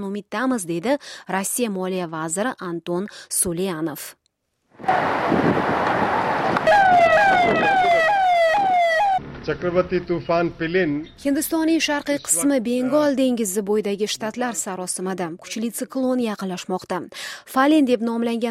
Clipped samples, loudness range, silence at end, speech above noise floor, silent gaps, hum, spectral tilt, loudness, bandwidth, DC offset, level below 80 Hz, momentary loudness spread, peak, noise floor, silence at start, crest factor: under 0.1%; 8 LU; 0 s; 50 dB; none; none; -4 dB/octave; -21 LUFS; 16 kHz; under 0.1%; -52 dBFS; 11 LU; -4 dBFS; -70 dBFS; 0 s; 16 dB